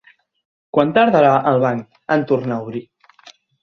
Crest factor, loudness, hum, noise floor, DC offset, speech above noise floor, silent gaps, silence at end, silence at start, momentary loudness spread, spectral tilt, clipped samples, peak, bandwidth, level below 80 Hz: 18 dB; -17 LUFS; none; -48 dBFS; under 0.1%; 32 dB; none; 0.8 s; 0.75 s; 14 LU; -8 dB/octave; under 0.1%; 0 dBFS; 6.8 kHz; -60 dBFS